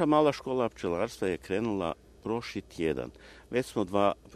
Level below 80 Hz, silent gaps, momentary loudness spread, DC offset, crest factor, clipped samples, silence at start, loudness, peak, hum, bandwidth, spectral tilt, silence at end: -56 dBFS; none; 9 LU; under 0.1%; 20 dB; under 0.1%; 0 s; -31 LUFS; -10 dBFS; none; 13.5 kHz; -6 dB/octave; 0 s